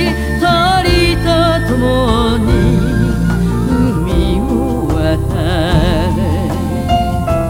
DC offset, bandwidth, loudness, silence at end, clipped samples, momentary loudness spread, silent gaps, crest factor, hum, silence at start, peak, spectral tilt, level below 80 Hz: under 0.1%; 16.5 kHz; -13 LUFS; 0 s; under 0.1%; 4 LU; none; 12 dB; none; 0 s; 0 dBFS; -6.5 dB/octave; -20 dBFS